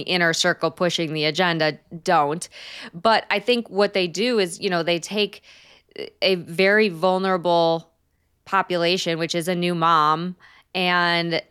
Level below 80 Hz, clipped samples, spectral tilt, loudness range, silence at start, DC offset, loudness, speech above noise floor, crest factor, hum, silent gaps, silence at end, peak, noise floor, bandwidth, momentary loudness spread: -70 dBFS; under 0.1%; -4 dB/octave; 1 LU; 0 s; under 0.1%; -21 LUFS; 46 dB; 16 dB; none; none; 0.1 s; -6 dBFS; -67 dBFS; 15.5 kHz; 8 LU